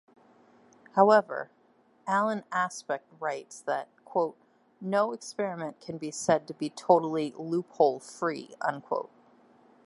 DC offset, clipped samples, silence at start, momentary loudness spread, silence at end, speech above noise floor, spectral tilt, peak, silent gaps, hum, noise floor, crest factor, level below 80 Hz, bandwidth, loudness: under 0.1%; under 0.1%; 0.95 s; 14 LU; 0.8 s; 34 dB; -5 dB/octave; -6 dBFS; none; none; -63 dBFS; 24 dB; -78 dBFS; 11.5 kHz; -29 LUFS